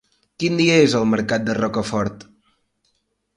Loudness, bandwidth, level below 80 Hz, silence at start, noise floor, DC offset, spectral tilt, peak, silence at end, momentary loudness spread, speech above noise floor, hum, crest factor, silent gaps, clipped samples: -19 LUFS; 11.5 kHz; -52 dBFS; 0.4 s; -69 dBFS; under 0.1%; -5 dB/octave; -2 dBFS; 1.15 s; 10 LU; 51 dB; none; 18 dB; none; under 0.1%